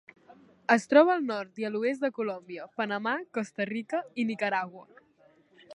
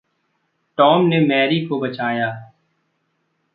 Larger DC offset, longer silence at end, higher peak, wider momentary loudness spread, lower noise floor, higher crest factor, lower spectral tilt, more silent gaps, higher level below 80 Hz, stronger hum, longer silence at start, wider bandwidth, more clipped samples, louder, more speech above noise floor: neither; second, 0 s vs 1.1 s; second, -6 dBFS vs -2 dBFS; about the same, 13 LU vs 12 LU; second, -63 dBFS vs -69 dBFS; first, 24 dB vs 18 dB; second, -5 dB/octave vs -10 dB/octave; neither; second, -84 dBFS vs -68 dBFS; neither; second, 0.3 s vs 0.8 s; first, 11 kHz vs 5 kHz; neither; second, -28 LUFS vs -17 LUFS; second, 34 dB vs 52 dB